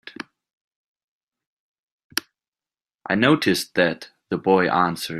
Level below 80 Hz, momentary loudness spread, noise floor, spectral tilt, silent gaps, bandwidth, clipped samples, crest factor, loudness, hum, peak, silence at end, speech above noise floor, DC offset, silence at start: -64 dBFS; 20 LU; under -90 dBFS; -4.5 dB/octave; 0.53-0.95 s, 1.03-1.27 s, 1.46-2.10 s, 2.48-2.52 s; 15.5 kHz; under 0.1%; 22 dB; -21 LUFS; none; -2 dBFS; 0 s; over 70 dB; under 0.1%; 0.05 s